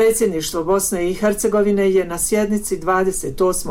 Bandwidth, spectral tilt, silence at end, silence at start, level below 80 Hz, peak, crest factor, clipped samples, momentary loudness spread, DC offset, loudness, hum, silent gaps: 17 kHz; -4 dB/octave; 0 s; 0 s; -38 dBFS; -8 dBFS; 10 dB; under 0.1%; 4 LU; under 0.1%; -18 LUFS; none; none